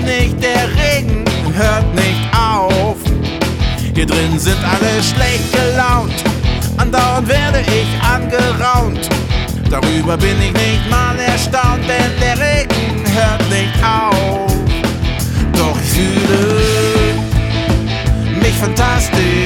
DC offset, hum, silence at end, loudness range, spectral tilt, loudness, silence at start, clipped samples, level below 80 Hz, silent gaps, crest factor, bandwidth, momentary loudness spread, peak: under 0.1%; none; 0 s; 1 LU; -5 dB/octave; -14 LUFS; 0 s; under 0.1%; -20 dBFS; none; 12 dB; 18 kHz; 4 LU; 0 dBFS